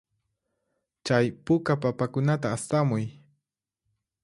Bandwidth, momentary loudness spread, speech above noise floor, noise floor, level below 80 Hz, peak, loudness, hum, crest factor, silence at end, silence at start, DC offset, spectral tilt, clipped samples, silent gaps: 11.5 kHz; 6 LU; 59 dB; -85 dBFS; -62 dBFS; -8 dBFS; -26 LUFS; none; 20 dB; 1.1 s; 1.05 s; under 0.1%; -6.5 dB/octave; under 0.1%; none